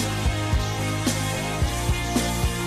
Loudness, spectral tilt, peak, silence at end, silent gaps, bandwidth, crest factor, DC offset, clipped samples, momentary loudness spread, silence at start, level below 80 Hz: -25 LUFS; -4.5 dB/octave; -12 dBFS; 0 s; none; 15.5 kHz; 12 dB; under 0.1%; under 0.1%; 1 LU; 0 s; -30 dBFS